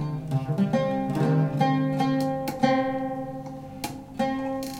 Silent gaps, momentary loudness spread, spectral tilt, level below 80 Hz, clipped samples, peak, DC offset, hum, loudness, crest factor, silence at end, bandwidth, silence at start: none; 12 LU; -7 dB/octave; -54 dBFS; under 0.1%; -6 dBFS; under 0.1%; none; -26 LUFS; 20 dB; 0 s; 16.5 kHz; 0 s